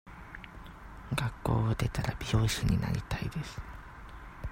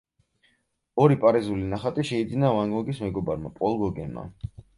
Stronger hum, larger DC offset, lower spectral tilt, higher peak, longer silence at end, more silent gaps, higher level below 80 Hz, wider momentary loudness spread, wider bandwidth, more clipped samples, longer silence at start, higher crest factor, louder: neither; neither; second, -5.5 dB/octave vs -8 dB/octave; second, -14 dBFS vs -6 dBFS; second, 0 s vs 0.3 s; neither; first, -42 dBFS vs -50 dBFS; first, 19 LU vs 15 LU; first, 16 kHz vs 11.5 kHz; neither; second, 0.05 s vs 0.95 s; about the same, 20 dB vs 20 dB; second, -32 LUFS vs -25 LUFS